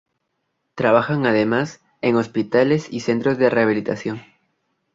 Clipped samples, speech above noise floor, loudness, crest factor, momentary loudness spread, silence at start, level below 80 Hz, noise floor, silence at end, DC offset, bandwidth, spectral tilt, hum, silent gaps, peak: under 0.1%; 55 dB; -20 LUFS; 18 dB; 11 LU; 0.75 s; -60 dBFS; -74 dBFS; 0.75 s; under 0.1%; 7.8 kHz; -6.5 dB/octave; none; none; -2 dBFS